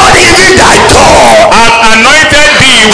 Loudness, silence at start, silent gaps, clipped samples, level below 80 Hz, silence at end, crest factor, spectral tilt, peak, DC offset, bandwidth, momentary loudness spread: -1 LUFS; 0 s; none; 40%; -20 dBFS; 0 s; 2 dB; -2.5 dB/octave; 0 dBFS; under 0.1%; 11 kHz; 1 LU